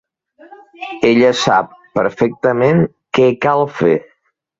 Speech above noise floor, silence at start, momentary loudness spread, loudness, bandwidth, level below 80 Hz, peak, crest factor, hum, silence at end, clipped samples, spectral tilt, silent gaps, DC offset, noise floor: 31 dB; 0.8 s; 8 LU; -14 LUFS; 7.8 kHz; -52 dBFS; 0 dBFS; 14 dB; none; 0.6 s; under 0.1%; -6 dB/octave; none; under 0.1%; -45 dBFS